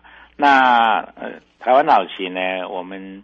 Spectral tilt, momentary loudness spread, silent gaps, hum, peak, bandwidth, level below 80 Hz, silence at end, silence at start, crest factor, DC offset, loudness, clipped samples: -5 dB/octave; 20 LU; none; none; -2 dBFS; 7.4 kHz; -60 dBFS; 0.05 s; 0.4 s; 16 dB; under 0.1%; -16 LUFS; under 0.1%